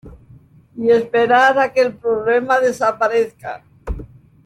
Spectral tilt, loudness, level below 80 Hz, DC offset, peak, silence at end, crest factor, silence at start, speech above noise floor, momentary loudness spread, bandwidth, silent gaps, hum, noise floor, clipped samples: -5 dB/octave; -16 LUFS; -40 dBFS; under 0.1%; -2 dBFS; 0.4 s; 16 dB; 0.05 s; 30 dB; 19 LU; 12.5 kHz; none; none; -46 dBFS; under 0.1%